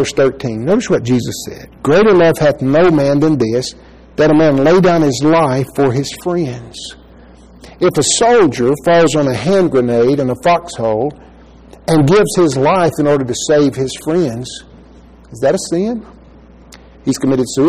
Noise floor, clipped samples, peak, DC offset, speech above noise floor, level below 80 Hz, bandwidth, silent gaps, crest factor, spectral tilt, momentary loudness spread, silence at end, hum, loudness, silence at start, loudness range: -40 dBFS; under 0.1%; -2 dBFS; 0.5%; 28 dB; -42 dBFS; 15 kHz; none; 10 dB; -5.5 dB/octave; 13 LU; 0 s; none; -13 LUFS; 0 s; 5 LU